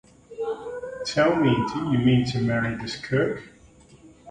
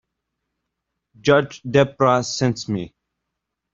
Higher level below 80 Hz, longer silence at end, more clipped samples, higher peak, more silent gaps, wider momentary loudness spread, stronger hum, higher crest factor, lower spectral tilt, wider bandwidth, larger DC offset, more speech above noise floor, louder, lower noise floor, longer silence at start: about the same, -52 dBFS vs -56 dBFS; second, 0 s vs 0.85 s; neither; second, -8 dBFS vs -2 dBFS; neither; first, 13 LU vs 10 LU; neither; about the same, 16 dB vs 20 dB; about the same, -6.5 dB/octave vs -5.5 dB/octave; first, 9.8 kHz vs 7.8 kHz; neither; second, 29 dB vs 62 dB; second, -24 LUFS vs -20 LUFS; second, -52 dBFS vs -80 dBFS; second, 0.3 s vs 1.25 s